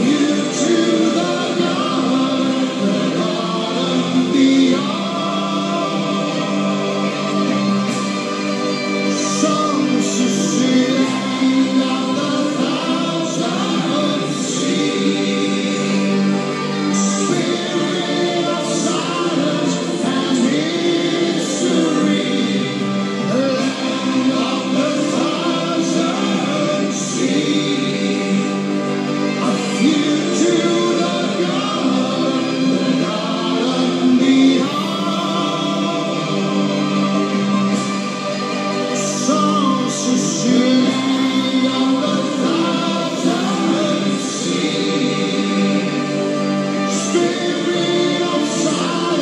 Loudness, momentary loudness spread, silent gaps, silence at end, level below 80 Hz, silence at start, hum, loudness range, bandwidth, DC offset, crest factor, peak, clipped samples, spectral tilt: -17 LUFS; 4 LU; none; 0 s; -74 dBFS; 0 s; none; 2 LU; 11.5 kHz; under 0.1%; 14 dB; -2 dBFS; under 0.1%; -4.5 dB/octave